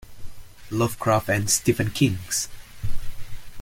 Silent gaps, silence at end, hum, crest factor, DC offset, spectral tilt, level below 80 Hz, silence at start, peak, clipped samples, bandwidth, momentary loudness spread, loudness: none; 0 s; none; 18 dB; under 0.1%; -4 dB/octave; -38 dBFS; 0.05 s; -6 dBFS; under 0.1%; 17 kHz; 20 LU; -23 LUFS